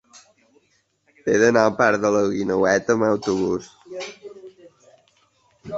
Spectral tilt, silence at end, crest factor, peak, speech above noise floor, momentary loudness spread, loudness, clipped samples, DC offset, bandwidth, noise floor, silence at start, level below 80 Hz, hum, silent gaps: -5 dB/octave; 0 s; 20 dB; -2 dBFS; 46 dB; 18 LU; -20 LUFS; under 0.1%; under 0.1%; 8 kHz; -65 dBFS; 1.25 s; -58 dBFS; none; none